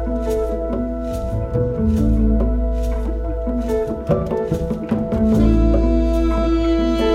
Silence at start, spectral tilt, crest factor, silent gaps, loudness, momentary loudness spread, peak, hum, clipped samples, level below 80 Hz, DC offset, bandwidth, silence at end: 0 s; -8.5 dB/octave; 14 dB; none; -19 LUFS; 8 LU; -4 dBFS; none; under 0.1%; -22 dBFS; under 0.1%; 8.2 kHz; 0 s